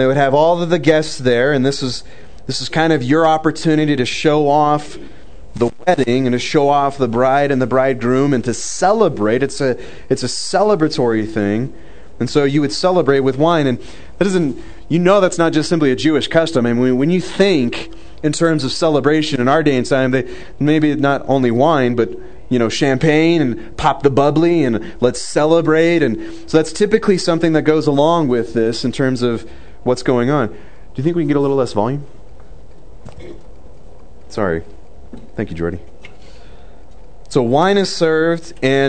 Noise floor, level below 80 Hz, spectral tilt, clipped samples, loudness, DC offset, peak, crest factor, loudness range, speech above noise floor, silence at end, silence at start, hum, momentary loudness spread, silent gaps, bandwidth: -41 dBFS; -44 dBFS; -5.5 dB/octave; under 0.1%; -15 LUFS; 3%; 0 dBFS; 16 dB; 7 LU; 26 dB; 0 s; 0 s; none; 9 LU; none; 9.4 kHz